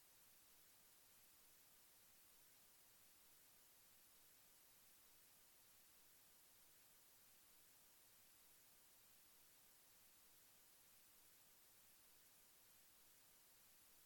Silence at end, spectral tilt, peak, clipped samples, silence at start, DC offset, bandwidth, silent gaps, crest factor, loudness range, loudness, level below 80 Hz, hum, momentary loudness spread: 0 s; -0.5 dB/octave; -58 dBFS; under 0.1%; 0 s; under 0.1%; 18 kHz; none; 14 dB; 0 LU; -68 LUFS; under -90 dBFS; none; 0 LU